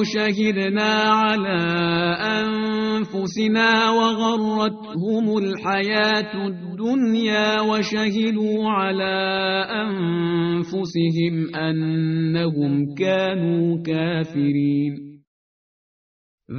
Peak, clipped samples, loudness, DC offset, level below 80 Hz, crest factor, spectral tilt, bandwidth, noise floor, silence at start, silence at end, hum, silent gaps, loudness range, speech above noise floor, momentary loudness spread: -6 dBFS; under 0.1%; -21 LUFS; under 0.1%; -60 dBFS; 16 dB; -4 dB/octave; 6.6 kHz; under -90 dBFS; 0 s; 0 s; none; 15.27-16.38 s; 2 LU; over 69 dB; 6 LU